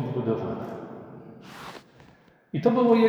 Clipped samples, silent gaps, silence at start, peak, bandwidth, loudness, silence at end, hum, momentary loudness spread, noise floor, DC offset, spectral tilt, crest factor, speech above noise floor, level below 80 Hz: under 0.1%; none; 0 s; -8 dBFS; 7.8 kHz; -27 LUFS; 0 s; none; 22 LU; -56 dBFS; under 0.1%; -8 dB/octave; 18 dB; 34 dB; -66 dBFS